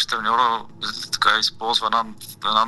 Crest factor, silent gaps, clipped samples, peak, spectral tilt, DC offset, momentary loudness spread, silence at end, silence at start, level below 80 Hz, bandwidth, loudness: 20 dB; none; under 0.1%; -2 dBFS; -1 dB/octave; under 0.1%; 10 LU; 0 s; 0 s; -58 dBFS; 12.5 kHz; -20 LUFS